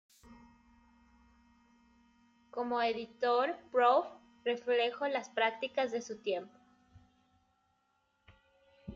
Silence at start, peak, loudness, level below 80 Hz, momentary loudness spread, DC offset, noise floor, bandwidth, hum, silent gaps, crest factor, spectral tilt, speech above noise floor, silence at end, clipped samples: 0.3 s; -16 dBFS; -33 LUFS; -74 dBFS; 12 LU; under 0.1%; -77 dBFS; 7.6 kHz; none; none; 22 dB; -3.5 dB/octave; 44 dB; 0 s; under 0.1%